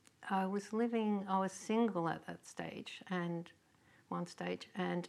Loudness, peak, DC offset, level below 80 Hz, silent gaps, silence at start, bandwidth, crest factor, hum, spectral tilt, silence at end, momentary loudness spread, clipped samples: -39 LUFS; -22 dBFS; under 0.1%; -84 dBFS; none; 0.2 s; 12.5 kHz; 18 dB; none; -6 dB/octave; 0 s; 11 LU; under 0.1%